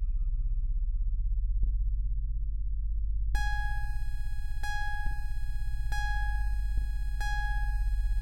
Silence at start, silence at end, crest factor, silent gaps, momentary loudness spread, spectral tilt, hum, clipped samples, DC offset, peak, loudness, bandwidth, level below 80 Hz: 0 s; 0 s; 12 dB; none; 5 LU; -4 dB/octave; none; under 0.1%; under 0.1%; -16 dBFS; -35 LUFS; 11.5 kHz; -30 dBFS